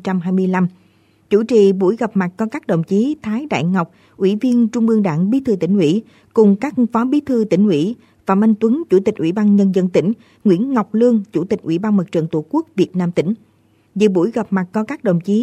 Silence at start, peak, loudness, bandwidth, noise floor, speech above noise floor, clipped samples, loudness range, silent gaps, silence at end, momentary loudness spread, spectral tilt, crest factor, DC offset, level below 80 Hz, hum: 0.05 s; -2 dBFS; -17 LUFS; 8.6 kHz; -54 dBFS; 38 dB; under 0.1%; 3 LU; none; 0 s; 7 LU; -8 dB/octave; 14 dB; under 0.1%; -60 dBFS; none